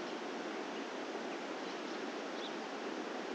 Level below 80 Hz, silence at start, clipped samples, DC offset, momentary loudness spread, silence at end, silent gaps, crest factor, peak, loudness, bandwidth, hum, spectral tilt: under -90 dBFS; 0 s; under 0.1%; under 0.1%; 0 LU; 0 s; none; 14 dB; -30 dBFS; -42 LUFS; 12.5 kHz; none; -3.5 dB/octave